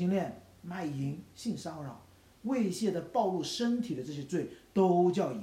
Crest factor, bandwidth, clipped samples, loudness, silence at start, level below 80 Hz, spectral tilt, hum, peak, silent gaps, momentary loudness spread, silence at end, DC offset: 18 dB; 15.5 kHz; under 0.1%; -33 LUFS; 0 s; -68 dBFS; -6.5 dB/octave; none; -16 dBFS; none; 15 LU; 0 s; under 0.1%